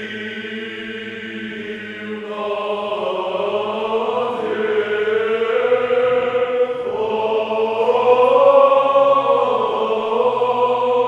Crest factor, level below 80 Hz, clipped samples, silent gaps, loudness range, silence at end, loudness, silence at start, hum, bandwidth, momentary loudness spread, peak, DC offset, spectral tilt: 16 dB; -64 dBFS; under 0.1%; none; 9 LU; 0 s; -18 LUFS; 0 s; none; 7.6 kHz; 15 LU; 0 dBFS; under 0.1%; -5.5 dB/octave